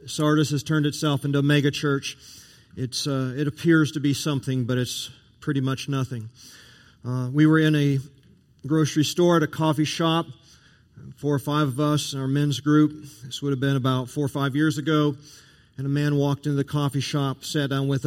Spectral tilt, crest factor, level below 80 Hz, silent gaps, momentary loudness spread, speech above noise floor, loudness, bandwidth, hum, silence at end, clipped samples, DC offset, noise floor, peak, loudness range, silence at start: -6 dB/octave; 18 dB; -60 dBFS; none; 12 LU; 32 dB; -24 LUFS; 16 kHz; none; 0 s; under 0.1%; under 0.1%; -55 dBFS; -6 dBFS; 3 LU; 0 s